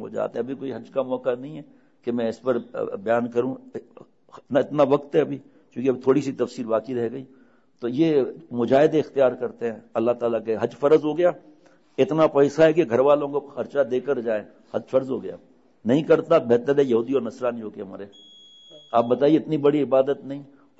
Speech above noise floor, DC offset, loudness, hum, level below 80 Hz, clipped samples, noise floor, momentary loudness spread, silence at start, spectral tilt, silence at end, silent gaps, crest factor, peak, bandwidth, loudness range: 26 dB; under 0.1%; -23 LUFS; none; -68 dBFS; under 0.1%; -49 dBFS; 16 LU; 0 s; -7.5 dB/octave; 0.35 s; none; 16 dB; -6 dBFS; 8 kHz; 6 LU